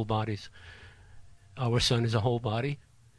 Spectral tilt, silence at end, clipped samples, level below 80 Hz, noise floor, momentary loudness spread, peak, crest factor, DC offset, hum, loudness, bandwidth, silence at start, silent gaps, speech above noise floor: -5.5 dB/octave; 0.35 s; under 0.1%; -52 dBFS; -51 dBFS; 23 LU; -12 dBFS; 18 dB; under 0.1%; none; -29 LUFS; 11 kHz; 0 s; none; 22 dB